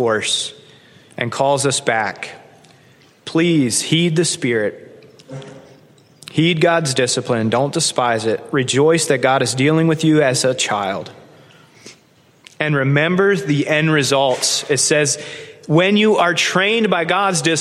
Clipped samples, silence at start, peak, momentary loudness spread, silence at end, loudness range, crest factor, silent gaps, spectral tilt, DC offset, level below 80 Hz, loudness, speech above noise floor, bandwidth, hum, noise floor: under 0.1%; 0 s; -2 dBFS; 10 LU; 0 s; 4 LU; 16 dB; none; -4 dB/octave; under 0.1%; -62 dBFS; -16 LUFS; 36 dB; 14 kHz; none; -52 dBFS